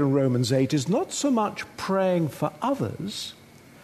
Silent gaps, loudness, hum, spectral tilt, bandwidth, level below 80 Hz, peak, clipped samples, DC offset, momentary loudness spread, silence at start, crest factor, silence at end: none; -25 LUFS; none; -5.5 dB/octave; 13.5 kHz; -62 dBFS; -10 dBFS; under 0.1%; under 0.1%; 10 LU; 0 s; 16 dB; 0.5 s